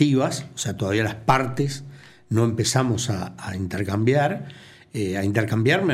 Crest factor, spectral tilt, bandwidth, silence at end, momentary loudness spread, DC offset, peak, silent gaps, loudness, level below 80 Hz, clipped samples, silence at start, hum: 18 dB; -5.5 dB/octave; 15 kHz; 0 s; 11 LU; under 0.1%; -4 dBFS; none; -23 LUFS; -54 dBFS; under 0.1%; 0 s; none